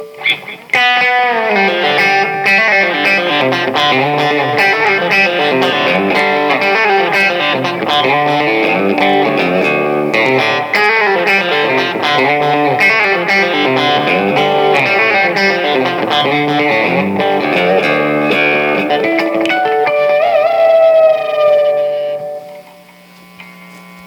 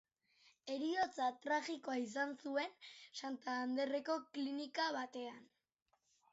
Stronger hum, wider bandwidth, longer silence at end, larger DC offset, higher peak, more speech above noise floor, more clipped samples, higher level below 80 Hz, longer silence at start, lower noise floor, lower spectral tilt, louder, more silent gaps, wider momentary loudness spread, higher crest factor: neither; first, 19 kHz vs 7.6 kHz; second, 0 s vs 0.9 s; neither; first, 0 dBFS vs -26 dBFS; second, 27 dB vs 32 dB; neither; first, -64 dBFS vs -88 dBFS; second, 0 s vs 0.65 s; second, -40 dBFS vs -73 dBFS; first, -5 dB/octave vs -0.5 dB/octave; first, -11 LUFS vs -42 LUFS; neither; second, 4 LU vs 11 LU; about the same, 12 dB vs 16 dB